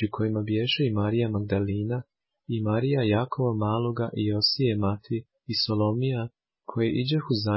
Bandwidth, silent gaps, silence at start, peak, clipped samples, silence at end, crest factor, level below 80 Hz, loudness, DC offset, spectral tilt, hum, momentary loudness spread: 5.8 kHz; none; 0 s; -10 dBFS; under 0.1%; 0 s; 16 dB; -52 dBFS; -26 LUFS; under 0.1%; -10 dB/octave; none; 9 LU